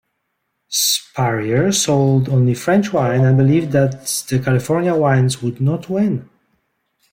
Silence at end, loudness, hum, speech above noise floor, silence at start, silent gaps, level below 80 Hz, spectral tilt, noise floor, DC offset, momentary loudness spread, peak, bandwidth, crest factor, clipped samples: 0.9 s; -16 LUFS; none; 56 dB; 0.7 s; none; -54 dBFS; -5 dB/octave; -72 dBFS; under 0.1%; 5 LU; -4 dBFS; 16.5 kHz; 14 dB; under 0.1%